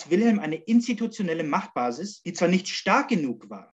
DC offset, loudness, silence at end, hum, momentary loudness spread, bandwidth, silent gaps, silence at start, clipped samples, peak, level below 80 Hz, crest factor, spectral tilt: under 0.1%; -25 LUFS; 0.1 s; none; 9 LU; 8.2 kHz; none; 0 s; under 0.1%; -6 dBFS; -74 dBFS; 18 dB; -5.5 dB/octave